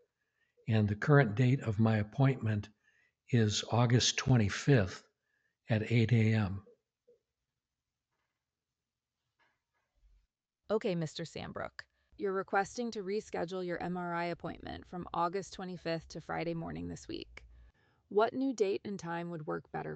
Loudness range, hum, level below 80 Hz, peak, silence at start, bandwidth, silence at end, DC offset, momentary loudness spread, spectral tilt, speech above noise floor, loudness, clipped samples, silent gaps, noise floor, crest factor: 11 LU; none; -64 dBFS; -12 dBFS; 0.65 s; 8.4 kHz; 0 s; under 0.1%; 15 LU; -6 dB/octave; over 58 dB; -33 LUFS; under 0.1%; none; under -90 dBFS; 22 dB